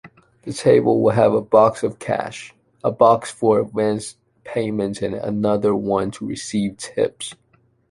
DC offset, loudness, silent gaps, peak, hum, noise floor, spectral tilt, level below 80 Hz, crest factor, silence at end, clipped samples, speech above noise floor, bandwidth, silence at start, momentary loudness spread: under 0.1%; -19 LUFS; none; -2 dBFS; none; -60 dBFS; -6 dB/octave; -54 dBFS; 18 dB; 0.55 s; under 0.1%; 41 dB; 11.5 kHz; 0.05 s; 14 LU